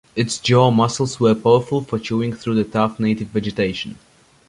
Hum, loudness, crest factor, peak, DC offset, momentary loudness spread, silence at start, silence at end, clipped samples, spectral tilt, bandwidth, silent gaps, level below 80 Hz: none; -19 LUFS; 18 dB; -2 dBFS; under 0.1%; 8 LU; 0.15 s; 0.55 s; under 0.1%; -6 dB/octave; 11 kHz; none; -50 dBFS